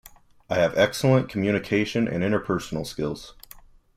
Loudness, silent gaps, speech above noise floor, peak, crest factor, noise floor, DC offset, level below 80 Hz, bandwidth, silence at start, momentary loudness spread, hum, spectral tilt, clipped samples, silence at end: -24 LUFS; none; 26 dB; -6 dBFS; 18 dB; -50 dBFS; under 0.1%; -52 dBFS; 16 kHz; 0.5 s; 10 LU; none; -6 dB/octave; under 0.1%; 0.65 s